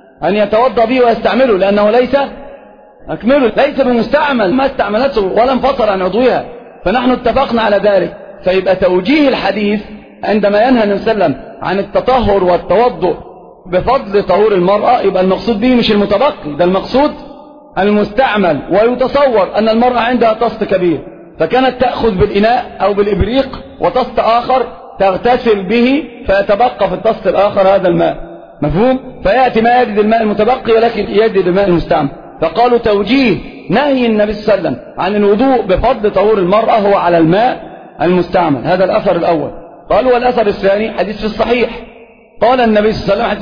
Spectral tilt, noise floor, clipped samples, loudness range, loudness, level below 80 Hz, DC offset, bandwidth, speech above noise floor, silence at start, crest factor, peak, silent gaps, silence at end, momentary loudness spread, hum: -8 dB/octave; -38 dBFS; under 0.1%; 2 LU; -12 LUFS; -34 dBFS; 0.4%; 5.2 kHz; 27 dB; 0.2 s; 12 dB; 0 dBFS; none; 0 s; 7 LU; none